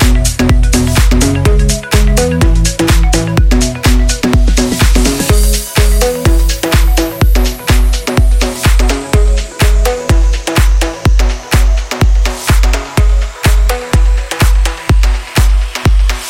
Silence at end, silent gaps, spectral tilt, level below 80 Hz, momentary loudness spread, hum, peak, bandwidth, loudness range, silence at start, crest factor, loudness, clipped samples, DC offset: 0 s; none; -4.5 dB/octave; -10 dBFS; 3 LU; none; 0 dBFS; 16.5 kHz; 2 LU; 0 s; 8 dB; -11 LUFS; under 0.1%; under 0.1%